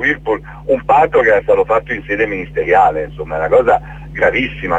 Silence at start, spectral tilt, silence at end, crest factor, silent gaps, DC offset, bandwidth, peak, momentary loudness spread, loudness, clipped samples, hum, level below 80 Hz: 0 s; -6.5 dB/octave; 0 s; 14 dB; none; under 0.1%; 7.8 kHz; 0 dBFS; 9 LU; -14 LUFS; under 0.1%; none; -36 dBFS